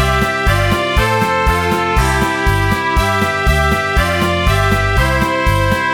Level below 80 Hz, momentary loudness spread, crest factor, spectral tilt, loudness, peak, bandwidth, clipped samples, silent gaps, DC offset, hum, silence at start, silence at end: -20 dBFS; 1 LU; 14 dB; -5 dB/octave; -14 LUFS; 0 dBFS; 19 kHz; under 0.1%; none; under 0.1%; none; 0 s; 0 s